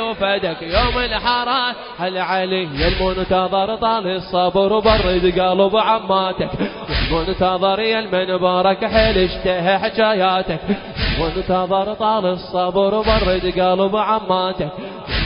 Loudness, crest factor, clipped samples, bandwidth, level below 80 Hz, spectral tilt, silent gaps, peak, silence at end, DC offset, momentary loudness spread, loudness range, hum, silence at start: -18 LUFS; 18 dB; under 0.1%; 5.4 kHz; -30 dBFS; -9.5 dB/octave; none; 0 dBFS; 0 s; under 0.1%; 7 LU; 2 LU; none; 0 s